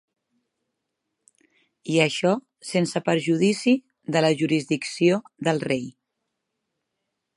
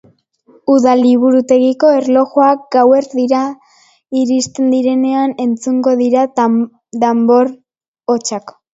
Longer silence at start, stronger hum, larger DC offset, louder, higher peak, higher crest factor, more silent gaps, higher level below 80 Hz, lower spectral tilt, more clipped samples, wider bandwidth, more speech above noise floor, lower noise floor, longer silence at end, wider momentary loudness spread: first, 1.85 s vs 0.7 s; neither; neither; second, -23 LUFS vs -13 LUFS; second, -4 dBFS vs 0 dBFS; first, 22 dB vs 12 dB; second, none vs 7.88-7.94 s; second, -72 dBFS vs -62 dBFS; about the same, -5.5 dB/octave vs -5 dB/octave; neither; first, 11.5 kHz vs 8 kHz; first, 58 dB vs 39 dB; first, -80 dBFS vs -50 dBFS; first, 1.45 s vs 0.25 s; about the same, 7 LU vs 8 LU